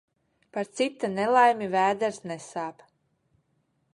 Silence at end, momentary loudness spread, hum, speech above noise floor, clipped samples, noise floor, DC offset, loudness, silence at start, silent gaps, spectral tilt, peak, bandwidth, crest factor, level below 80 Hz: 1.25 s; 16 LU; none; 47 dB; under 0.1%; -72 dBFS; under 0.1%; -26 LUFS; 0.55 s; none; -4.5 dB/octave; -8 dBFS; 11.5 kHz; 20 dB; -74 dBFS